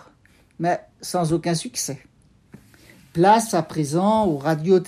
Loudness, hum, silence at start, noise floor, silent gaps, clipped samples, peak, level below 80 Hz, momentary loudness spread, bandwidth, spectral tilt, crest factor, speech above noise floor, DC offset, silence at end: -21 LUFS; none; 0.6 s; -56 dBFS; none; under 0.1%; -4 dBFS; -56 dBFS; 11 LU; 15.5 kHz; -5.5 dB/octave; 18 dB; 36 dB; under 0.1%; 0 s